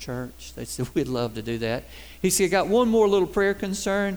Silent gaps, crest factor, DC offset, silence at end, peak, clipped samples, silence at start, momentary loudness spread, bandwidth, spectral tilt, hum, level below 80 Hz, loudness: none; 16 dB; 0.3%; 0 s; -10 dBFS; under 0.1%; 0 s; 14 LU; over 20 kHz; -4.5 dB/octave; none; -46 dBFS; -24 LUFS